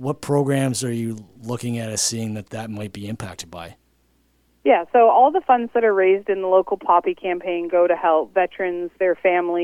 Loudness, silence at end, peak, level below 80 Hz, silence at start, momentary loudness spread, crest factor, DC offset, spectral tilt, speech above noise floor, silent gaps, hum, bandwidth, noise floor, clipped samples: -19 LUFS; 0 s; -4 dBFS; -60 dBFS; 0 s; 15 LU; 16 dB; under 0.1%; -5 dB/octave; 42 dB; none; none; 15.5 kHz; -62 dBFS; under 0.1%